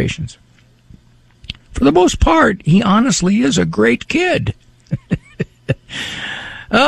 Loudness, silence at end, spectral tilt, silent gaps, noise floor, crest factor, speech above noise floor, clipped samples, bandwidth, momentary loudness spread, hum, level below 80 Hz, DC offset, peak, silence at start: -15 LUFS; 0 s; -5 dB/octave; none; -47 dBFS; 14 dB; 33 dB; under 0.1%; 12.5 kHz; 15 LU; none; -30 dBFS; under 0.1%; -2 dBFS; 0 s